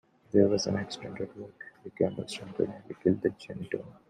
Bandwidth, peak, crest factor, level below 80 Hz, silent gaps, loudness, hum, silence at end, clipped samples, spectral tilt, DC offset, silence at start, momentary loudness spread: 10.5 kHz; -8 dBFS; 22 dB; -66 dBFS; none; -31 LUFS; none; 0.15 s; under 0.1%; -6 dB/octave; under 0.1%; 0.35 s; 18 LU